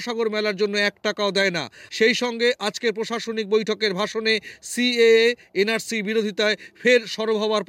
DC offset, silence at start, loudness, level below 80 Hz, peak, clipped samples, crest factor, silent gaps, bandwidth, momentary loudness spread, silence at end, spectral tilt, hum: under 0.1%; 0 s; -21 LUFS; -70 dBFS; -6 dBFS; under 0.1%; 16 dB; none; 16 kHz; 7 LU; 0.05 s; -3.5 dB/octave; none